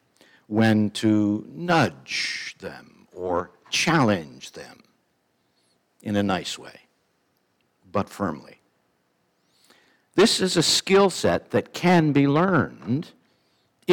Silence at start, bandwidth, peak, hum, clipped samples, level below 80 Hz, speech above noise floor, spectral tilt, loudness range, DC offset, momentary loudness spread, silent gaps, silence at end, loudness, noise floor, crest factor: 0.5 s; 18.5 kHz; -6 dBFS; none; under 0.1%; -62 dBFS; 47 dB; -4.5 dB/octave; 12 LU; under 0.1%; 17 LU; none; 0 s; -22 LUFS; -69 dBFS; 18 dB